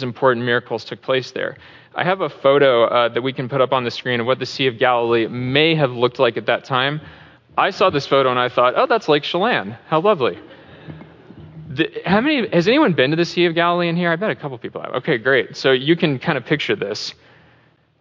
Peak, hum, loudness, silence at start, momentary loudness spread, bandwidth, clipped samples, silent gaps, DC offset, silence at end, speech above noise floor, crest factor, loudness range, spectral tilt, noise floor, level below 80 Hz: -2 dBFS; none; -18 LUFS; 0 s; 11 LU; 7.6 kHz; under 0.1%; none; under 0.1%; 0.9 s; 37 dB; 16 dB; 2 LU; -6 dB/octave; -55 dBFS; -58 dBFS